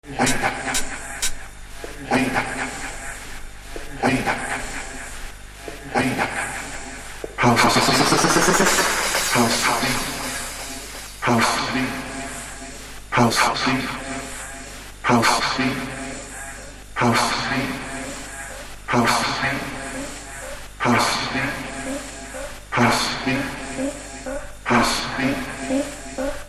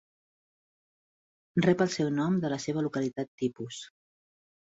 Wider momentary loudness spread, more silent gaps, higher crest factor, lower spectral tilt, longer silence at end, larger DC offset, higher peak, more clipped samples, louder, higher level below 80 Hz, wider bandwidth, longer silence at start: about the same, 17 LU vs 15 LU; second, none vs 3.28-3.38 s; about the same, 20 dB vs 20 dB; second, -3 dB/octave vs -6 dB/octave; second, 0 s vs 0.8 s; neither; first, -2 dBFS vs -12 dBFS; neither; first, -21 LUFS vs -29 LUFS; first, -40 dBFS vs -68 dBFS; first, 16 kHz vs 8 kHz; second, 0.05 s vs 1.55 s